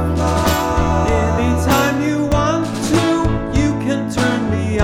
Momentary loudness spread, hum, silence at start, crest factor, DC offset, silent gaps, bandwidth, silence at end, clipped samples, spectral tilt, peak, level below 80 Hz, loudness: 3 LU; none; 0 s; 16 dB; 0.8%; none; 18 kHz; 0 s; under 0.1%; -6 dB/octave; 0 dBFS; -26 dBFS; -17 LUFS